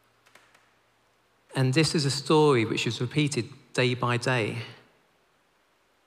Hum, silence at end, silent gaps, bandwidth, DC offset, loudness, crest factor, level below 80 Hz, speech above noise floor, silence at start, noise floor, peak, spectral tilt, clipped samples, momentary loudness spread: none; 1.3 s; none; 15 kHz; under 0.1%; -25 LUFS; 18 dB; -68 dBFS; 42 dB; 1.5 s; -67 dBFS; -10 dBFS; -5 dB/octave; under 0.1%; 11 LU